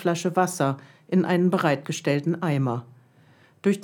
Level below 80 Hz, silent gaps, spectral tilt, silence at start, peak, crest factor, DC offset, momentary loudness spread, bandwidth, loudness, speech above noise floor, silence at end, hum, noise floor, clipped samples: -76 dBFS; none; -6 dB/octave; 0 s; -8 dBFS; 18 dB; under 0.1%; 6 LU; 18 kHz; -24 LUFS; 33 dB; 0 s; none; -56 dBFS; under 0.1%